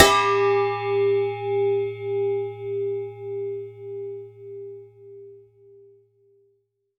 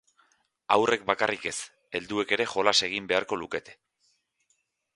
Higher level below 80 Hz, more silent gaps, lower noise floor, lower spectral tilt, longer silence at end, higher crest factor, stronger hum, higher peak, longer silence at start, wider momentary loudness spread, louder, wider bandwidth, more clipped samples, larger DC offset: first, -54 dBFS vs -66 dBFS; neither; second, -69 dBFS vs -74 dBFS; about the same, -3.5 dB/octave vs -2.5 dB/octave; first, 1.6 s vs 1.2 s; about the same, 24 dB vs 26 dB; neither; first, 0 dBFS vs -4 dBFS; second, 0 s vs 0.7 s; first, 21 LU vs 13 LU; first, -24 LUFS vs -27 LUFS; first, 16 kHz vs 11.5 kHz; neither; neither